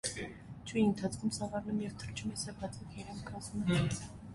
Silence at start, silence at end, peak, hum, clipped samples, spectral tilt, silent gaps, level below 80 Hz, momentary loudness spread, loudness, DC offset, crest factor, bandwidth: 0.05 s; 0 s; -18 dBFS; none; under 0.1%; -5 dB/octave; none; -56 dBFS; 13 LU; -37 LUFS; under 0.1%; 18 dB; 11.5 kHz